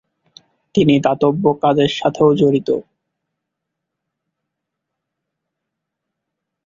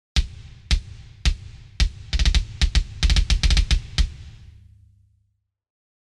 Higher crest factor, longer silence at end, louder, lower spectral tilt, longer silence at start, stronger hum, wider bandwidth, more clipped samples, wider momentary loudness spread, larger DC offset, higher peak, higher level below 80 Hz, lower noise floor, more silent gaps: about the same, 16 dB vs 18 dB; first, 3.85 s vs 1.9 s; first, -15 LUFS vs -24 LUFS; first, -7 dB/octave vs -3.5 dB/octave; first, 0.75 s vs 0.15 s; neither; second, 7.6 kHz vs 11 kHz; neither; second, 7 LU vs 21 LU; neither; about the same, -2 dBFS vs -4 dBFS; second, -56 dBFS vs -24 dBFS; first, -79 dBFS vs -70 dBFS; neither